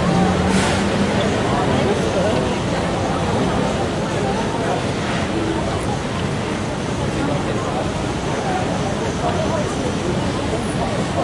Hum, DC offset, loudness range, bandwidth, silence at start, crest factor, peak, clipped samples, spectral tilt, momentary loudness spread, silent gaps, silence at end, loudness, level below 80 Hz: none; under 0.1%; 3 LU; 11.5 kHz; 0 s; 14 dB; -4 dBFS; under 0.1%; -5.5 dB/octave; 5 LU; none; 0 s; -20 LUFS; -36 dBFS